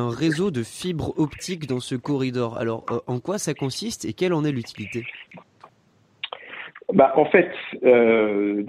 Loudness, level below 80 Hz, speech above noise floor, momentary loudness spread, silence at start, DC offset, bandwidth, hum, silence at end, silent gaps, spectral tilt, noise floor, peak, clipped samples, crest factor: -23 LUFS; -56 dBFS; 38 dB; 16 LU; 0 s; under 0.1%; 15 kHz; none; 0 s; none; -5.5 dB/octave; -60 dBFS; -4 dBFS; under 0.1%; 20 dB